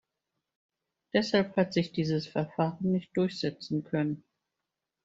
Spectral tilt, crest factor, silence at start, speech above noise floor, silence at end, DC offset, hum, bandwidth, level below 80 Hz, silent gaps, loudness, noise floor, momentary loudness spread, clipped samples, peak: -6.5 dB/octave; 20 dB; 1.15 s; 57 dB; 0.9 s; under 0.1%; none; 7.8 kHz; -68 dBFS; none; -30 LUFS; -87 dBFS; 7 LU; under 0.1%; -12 dBFS